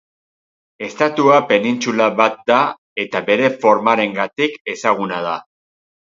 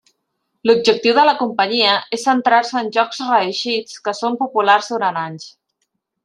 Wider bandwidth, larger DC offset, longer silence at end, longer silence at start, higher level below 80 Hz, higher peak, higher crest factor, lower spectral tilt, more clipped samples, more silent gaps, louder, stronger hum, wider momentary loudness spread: second, 7.8 kHz vs 11 kHz; neither; second, 0.6 s vs 0.75 s; first, 0.8 s vs 0.65 s; about the same, -66 dBFS vs -68 dBFS; about the same, 0 dBFS vs 0 dBFS; about the same, 18 dB vs 16 dB; first, -4.5 dB/octave vs -3 dB/octave; neither; first, 2.78-2.96 s, 4.61-4.65 s vs none; about the same, -16 LUFS vs -16 LUFS; neither; about the same, 10 LU vs 8 LU